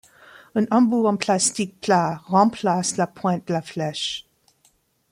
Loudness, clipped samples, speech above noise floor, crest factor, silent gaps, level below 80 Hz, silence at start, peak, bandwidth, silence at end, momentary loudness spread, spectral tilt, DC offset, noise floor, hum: -22 LUFS; under 0.1%; 42 dB; 20 dB; none; -64 dBFS; 0.55 s; -4 dBFS; 15.5 kHz; 0.9 s; 9 LU; -4.5 dB/octave; under 0.1%; -63 dBFS; none